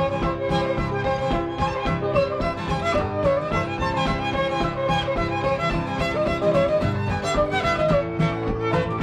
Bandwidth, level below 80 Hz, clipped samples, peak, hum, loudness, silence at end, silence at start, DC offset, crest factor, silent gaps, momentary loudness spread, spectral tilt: 10.5 kHz; -36 dBFS; under 0.1%; -8 dBFS; none; -23 LUFS; 0 s; 0 s; under 0.1%; 14 dB; none; 4 LU; -6.5 dB/octave